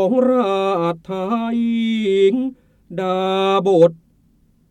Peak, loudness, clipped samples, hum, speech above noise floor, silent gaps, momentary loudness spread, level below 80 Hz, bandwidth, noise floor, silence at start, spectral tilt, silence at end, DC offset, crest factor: -2 dBFS; -18 LUFS; under 0.1%; none; 40 dB; none; 9 LU; -60 dBFS; 9.2 kHz; -56 dBFS; 0 s; -7 dB/octave; 0.75 s; under 0.1%; 16 dB